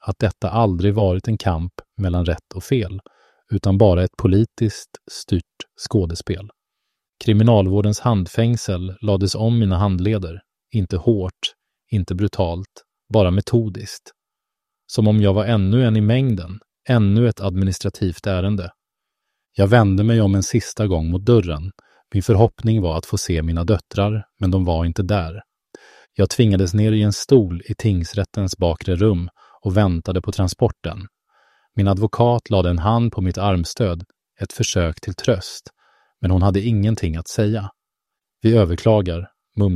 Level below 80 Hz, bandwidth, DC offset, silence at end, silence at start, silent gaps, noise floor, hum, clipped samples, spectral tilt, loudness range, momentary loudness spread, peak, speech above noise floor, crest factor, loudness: -38 dBFS; 13 kHz; under 0.1%; 0 s; 0.05 s; none; -84 dBFS; none; under 0.1%; -7 dB/octave; 4 LU; 14 LU; 0 dBFS; 66 dB; 18 dB; -19 LUFS